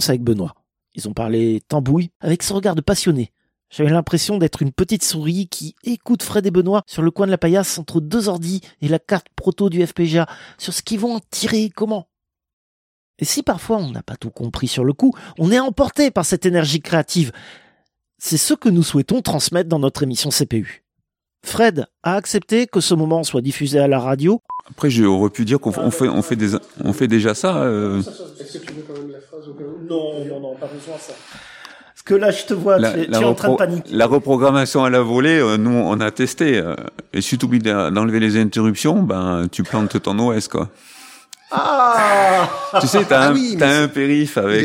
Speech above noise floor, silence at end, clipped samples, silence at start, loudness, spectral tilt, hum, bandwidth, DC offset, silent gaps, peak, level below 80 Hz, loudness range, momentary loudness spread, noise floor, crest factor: 59 dB; 0 s; under 0.1%; 0 s; -18 LUFS; -5 dB/octave; none; 16.5 kHz; under 0.1%; 2.16-2.20 s, 12.53-13.14 s; 0 dBFS; -48 dBFS; 7 LU; 14 LU; -76 dBFS; 18 dB